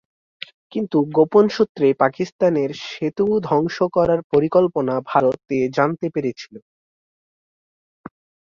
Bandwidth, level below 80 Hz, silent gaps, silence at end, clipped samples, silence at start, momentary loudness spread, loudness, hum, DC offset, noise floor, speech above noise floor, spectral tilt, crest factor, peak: 7.2 kHz; -56 dBFS; 1.69-1.75 s, 2.32-2.39 s, 4.24-4.30 s; 1.85 s; under 0.1%; 0.7 s; 12 LU; -19 LUFS; none; under 0.1%; under -90 dBFS; over 71 dB; -7 dB/octave; 18 dB; -2 dBFS